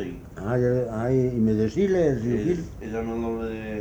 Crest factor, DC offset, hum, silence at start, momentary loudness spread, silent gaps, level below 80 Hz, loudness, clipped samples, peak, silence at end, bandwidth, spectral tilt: 14 dB; under 0.1%; none; 0 s; 9 LU; none; -44 dBFS; -25 LUFS; under 0.1%; -10 dBFS; 0 s; over 20 kHz; -8.5 dB/octave